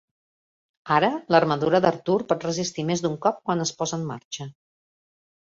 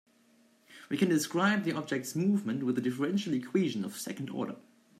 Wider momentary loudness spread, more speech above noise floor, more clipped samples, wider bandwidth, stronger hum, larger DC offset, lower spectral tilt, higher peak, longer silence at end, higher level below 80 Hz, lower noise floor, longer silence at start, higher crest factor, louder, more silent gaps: about the same, 12 LU vs 10 LU; first, over 67 dB vs 34 dB; neither; second, 7.8 kHz vs 15 kHz; neither; neither; about the same, -5 dB/octave vs -5.5 dB/octave; first, -2 dBFS vs -16 dBFS; first, 1 s vs 0.4 s; first, -64 dBFS vs -78 dBFS; first, under -90 dBFS vs -65 dBFS; first, 0.85 s vs 0.7 s; first, 22 dB vs 16 dB; first, -24 LUFS vs -31 LUFS; first, 4.25-4.31 s vs none